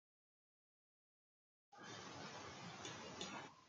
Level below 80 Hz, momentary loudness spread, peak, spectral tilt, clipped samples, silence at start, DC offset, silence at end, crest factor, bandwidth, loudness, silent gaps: -88 dBFS; 7 LU; -34 dBFS; -3 dB/octave; under 0.1%; 1.7 s; under 0.1%; 0 s; 22 dB; 9 kHz; -53 LUFS; none